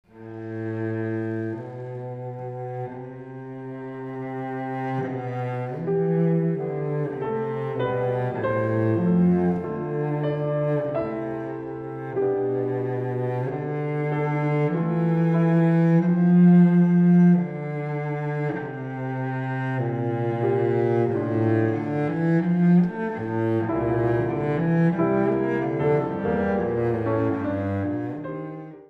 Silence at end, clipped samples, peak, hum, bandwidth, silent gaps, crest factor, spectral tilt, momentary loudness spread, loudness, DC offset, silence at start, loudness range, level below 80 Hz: 0.05 s; under 0.1%; -8 dBFS; none; 4 kHz; none; 16 dB; -10.5 dB/octave; 14 LU; -24 LUFS; under 0.1%; 0.15 s; 12 LU; -56 dBFS